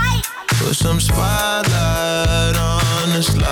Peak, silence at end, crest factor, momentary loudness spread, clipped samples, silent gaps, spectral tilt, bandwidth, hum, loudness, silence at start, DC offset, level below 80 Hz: -6 dBFS; 0 s; 10 dB; 2 LU; under 0.1%; none; -4 dB/octave; 18.5 kHz; none; -17 LUFS; 0 s; under 0.1%; -26 dBFS